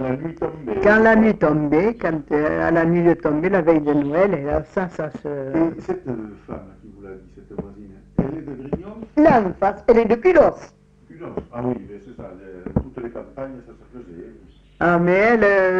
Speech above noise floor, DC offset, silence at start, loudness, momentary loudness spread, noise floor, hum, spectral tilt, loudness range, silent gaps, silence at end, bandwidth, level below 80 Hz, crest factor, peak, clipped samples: 28 dB; under 0.1%; 0 s; -19 LUFS; 23 LU; -47 dBFS; none; -8.5 dB/octave; 13 LU; none; 0 s; 7.6 kHz; -42 dBFS; 16 dB; -4 dBFS; under 0.1%